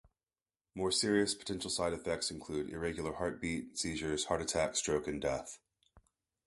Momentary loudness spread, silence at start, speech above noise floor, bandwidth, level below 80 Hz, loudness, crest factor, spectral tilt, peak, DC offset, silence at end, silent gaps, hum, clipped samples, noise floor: 8 LU; 0.75 s; over 54 dB; 12 kHz; -58 dBFS; -36 LUFS; 20 dB; -3.5 dB/octave; -18 dBFS; under 0.1%; 0.5 s; none; none; under 0.1%; under -90 dBFS